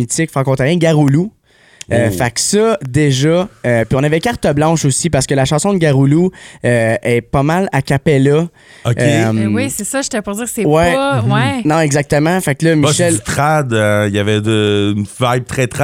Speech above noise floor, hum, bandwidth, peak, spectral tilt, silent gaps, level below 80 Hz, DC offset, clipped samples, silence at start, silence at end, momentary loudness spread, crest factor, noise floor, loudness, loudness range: 26 dB; none; 16.5 kHz; 0 dBFS; -5.5 dB/octave; none; -40 dBFS; under 0.1%; under 0.1%; 0 s; 0 s; 6 LU; 12 dB; -39 dBFS; -13 LUFS; 1 LU